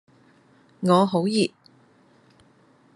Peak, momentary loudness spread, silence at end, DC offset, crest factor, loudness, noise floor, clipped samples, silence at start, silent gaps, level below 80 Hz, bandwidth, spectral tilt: -4 dBFS; 8 LU; 1.5 s; under 0.1%; 22 dB; -22 LUFS; -58 dBFS; under 0.1%; 0.8 s; none; -74 dBFS; 11.5 kHz; -6 dB/octave